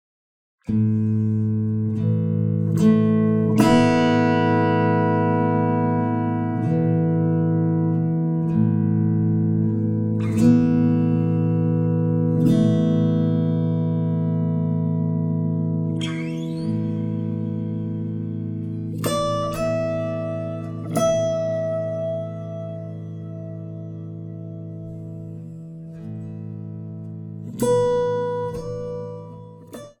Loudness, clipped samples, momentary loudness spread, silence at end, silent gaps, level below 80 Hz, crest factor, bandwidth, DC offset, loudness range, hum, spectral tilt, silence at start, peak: -21 LUFS; under 0.1%; 16 LU; 0.1 s; none; -50 dBFS; 18 dB; 14 kHz; under 0.1%; 13 LU; none; -8 dB/octave; 0.7 s; -2 dBFS